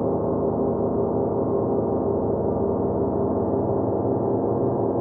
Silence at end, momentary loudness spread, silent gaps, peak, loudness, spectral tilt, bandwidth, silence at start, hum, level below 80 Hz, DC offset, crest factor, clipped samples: 0 s; 1 LU; none; -12 dBFS; -23 LUFS; -16 dB/octave; 2.1 kHz; 0 s; none; -46 dBFS; under 0.1%; 12 dB; under 0.1%